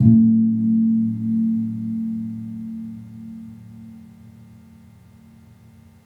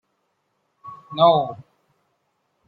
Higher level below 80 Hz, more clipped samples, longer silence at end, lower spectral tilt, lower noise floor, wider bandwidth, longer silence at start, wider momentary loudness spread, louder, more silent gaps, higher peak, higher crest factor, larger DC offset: first, -60 dBFS vs -68 dBFS; neither; first, 1.75 s vs 1.05 s; first, -11.5 dB/octave vs -8.5 dB/octave; second, -48 dBFS vs -72 dBFS; second, 2.1 kHz vs 4.7 kHz; second, 0 s vs 0.85 s; about the same, 24 LU vs 25 LU; about the same, -20 LUFS vs -19 LUFS; neither; about the same, -2 dBFS vs -4 dBFS; about the same, 20 dB vs 20 dB; neither